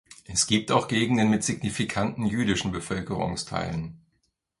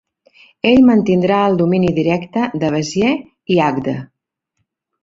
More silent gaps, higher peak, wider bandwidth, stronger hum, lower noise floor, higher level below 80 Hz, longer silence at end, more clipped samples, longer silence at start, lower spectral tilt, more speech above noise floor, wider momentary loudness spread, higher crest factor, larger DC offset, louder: neither; second, -6 dBFS vs -2 dBFS; first, 11.5 kHz vs 7.8 kHz; neither; about the same, -74 dBFS vs -72 dBFS; about the same, -50 dBFS vs -48 dBFS; second, 0.65 s vs 1 s; neither; second, 0.1 s vs 0.65 s; second, -4 dB/octave vs -6.5 dB/octave; second, 48 dB vs 58 dB; about the same, 8 LU vs 10 LU; first, 22 dB vs 14 dB; neither; second, -26 LUFS vs -15 LUFS